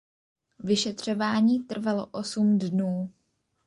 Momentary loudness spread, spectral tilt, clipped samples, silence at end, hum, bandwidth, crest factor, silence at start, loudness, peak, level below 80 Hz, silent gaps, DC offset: 9 LU; -5.5 dB/octave; under 0.1%; 0.55 s; none; 11 kHz; 16 dB; 0.65 s; -26 LUFS; -12 dBFS; -68 dBFS; none; under 0.1%